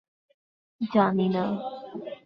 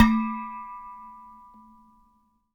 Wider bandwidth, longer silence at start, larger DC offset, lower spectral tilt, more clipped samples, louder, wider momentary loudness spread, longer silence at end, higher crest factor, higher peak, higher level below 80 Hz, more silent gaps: second, 5.8 kHz vs 7.4 kHz; first, 0.8 s vs 0 s; neither; first, -9.5 dB/octave vs -6 dB/octave; neither; about the same, -26 LUFS vs -28 LUFS; second, 15 LU vs 24 LU; second, 0.1 s vs 1.3 s; about the same, 20 dB vs 24 dB; second, -8 dBFS vs -4 dBFS; second, -68 dBFS vs -44 dBFS; neither